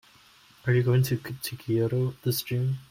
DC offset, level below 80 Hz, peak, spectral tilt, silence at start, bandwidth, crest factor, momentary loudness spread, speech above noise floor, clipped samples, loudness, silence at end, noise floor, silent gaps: under 0.1%; -60 dBFS; -12 dBFS; -6.5 dB/octave; 0.65 s; 16.5 kHz; 16 dB; 11 LU; 31 dB; under 0.1%; -27 LUFS; 0.05 s; -57 dBFS; none